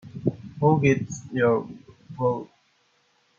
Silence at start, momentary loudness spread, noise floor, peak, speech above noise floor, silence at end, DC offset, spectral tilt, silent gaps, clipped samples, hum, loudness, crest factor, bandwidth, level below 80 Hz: 0.05 s; 13 LU; -66 dBFS; -8 dBFS; 43 dB; 0.95 s; under 0.1%; -7.5 dB/octave; none; under 0.1%; none; -24 LUFS; 18 dB; 7.6 kHz; -58 dBFS